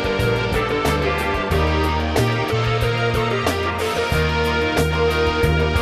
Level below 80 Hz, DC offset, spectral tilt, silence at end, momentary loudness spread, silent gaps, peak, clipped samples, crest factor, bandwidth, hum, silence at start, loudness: -28 dBFS; under 0.1%; -5.5 dB/octave; 0 s; 2 LU; none; -4 dBFS; under 0.1%; 14 dB; 14 kHz; none; 0 s; -19 LUFS